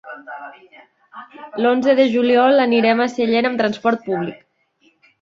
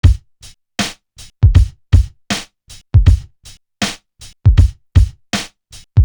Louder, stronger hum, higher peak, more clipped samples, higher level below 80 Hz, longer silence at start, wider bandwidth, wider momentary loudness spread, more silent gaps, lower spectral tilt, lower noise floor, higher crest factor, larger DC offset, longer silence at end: about the same, -16 LUFS vs -16 LUFS; neither; about the same, -2 dBFS vs 0 dBFS; neither; second, -66 dBFS vs -18 dBFS; about the same, 0.05 s vs 0.05 s; second, 7.6 kHz vs over 20 kHz; first, 21 LU vs 12 LU; neither; about the same, -6 dB/octave vs -5.5 dB/octave; first, -60 dBFS vs -43 dBFS; about the same, 16 dB vs 14 dB; neither; first, 0.9 s vs 0 s